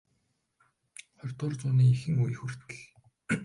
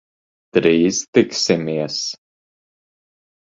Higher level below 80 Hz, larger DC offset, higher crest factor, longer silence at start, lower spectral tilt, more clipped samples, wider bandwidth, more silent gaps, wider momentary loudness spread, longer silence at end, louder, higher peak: second, -64 dBFS vs -58 dBFS; neither; about the same, 16 dB vs 20 dB; first, 1.25 s vs 0.55 s; first, -7 dB/octave vs -4 dB/octave; neither; first, 11 kHz vs 7.8 kHz; second, none vs 1.08-1.13 s; first, 25 LU vs 9 LU; second, 0 s vs 1.25 s; second, -29 LUFS vs -18 LUFS; second, -14 dBFS vs 0 dBFS